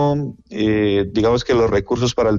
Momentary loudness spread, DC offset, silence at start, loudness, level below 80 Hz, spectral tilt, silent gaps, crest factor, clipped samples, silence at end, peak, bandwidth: 6 LU; under 0.1%; 0 s; -18 LUFS; -38 dBFS; -6.5 dB/octave; none; 10 dB; under 0.1%; 0 s; -6 dBFS; 7.6 kHz